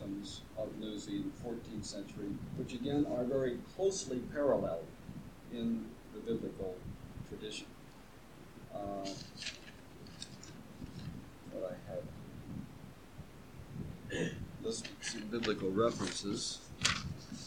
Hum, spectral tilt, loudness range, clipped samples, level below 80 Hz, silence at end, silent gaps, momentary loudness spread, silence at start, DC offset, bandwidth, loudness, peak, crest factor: none; -4.5 dB/octave; 11 LU; under 0.1%; -60 dBFS; 0 s; none; 19 LU; 0 s; under 0.1%; 18.5 kHz; -40 LUFS; -12 dBFS; 28 dB